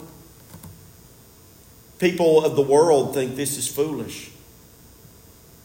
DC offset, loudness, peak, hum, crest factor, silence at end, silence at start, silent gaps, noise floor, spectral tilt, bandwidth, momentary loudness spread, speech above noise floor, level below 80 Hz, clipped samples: under 0.1%; -20 LUFS; -4 dBFS; none; 18 dB; 1.35 s; 0 s; none; -49 dBFS; -4.5 dB/octave; 16.5 kHz; 25 LU; 29 dB; -58 dBFS; under 0.1%